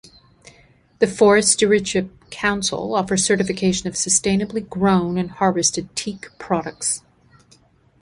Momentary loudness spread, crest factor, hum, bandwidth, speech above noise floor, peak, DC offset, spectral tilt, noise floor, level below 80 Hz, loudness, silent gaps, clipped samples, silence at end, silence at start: 12 LU; 18 dB; none; 11.5 kHz; 35 dB; -2 dBFS; under 0.1%; -3.5 dB/octave; -55 dBFS; -50 dBFS; -19 LUFS; none; under 0.1%; 1.05 s; 1 s